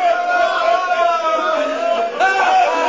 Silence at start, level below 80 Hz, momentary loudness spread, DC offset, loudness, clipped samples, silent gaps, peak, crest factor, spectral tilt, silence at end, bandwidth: 0 s; -60 dBFS; 4 LU; 0.2%; -16 LUFS; under 0.1%; none; -4 dBFS; 12 dB; -1.5 dB/octave; 0 s; 7.8 kHz